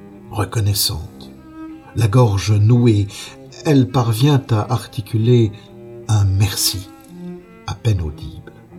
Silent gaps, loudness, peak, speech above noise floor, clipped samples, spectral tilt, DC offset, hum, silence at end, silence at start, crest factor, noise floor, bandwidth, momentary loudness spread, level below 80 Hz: none; -17 LUFS; -2 dBFS; 19 dB; under 0.1%; -6 dB/octave; under 0.1%; none; 0 s; 0 s; 16 dB; -35 dBFS; 17 kHz; 21 LU; -40 dBFS